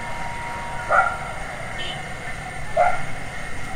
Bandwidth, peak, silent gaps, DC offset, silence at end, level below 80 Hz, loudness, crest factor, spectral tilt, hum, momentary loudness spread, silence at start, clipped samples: 15 kHz; -6 dBFS; none; under 0.1%; 0 s; -38 dBFS; -25 LUFS; 18 dB; -4 dB/octave; none; 12 LU; 0 s; under 0.1%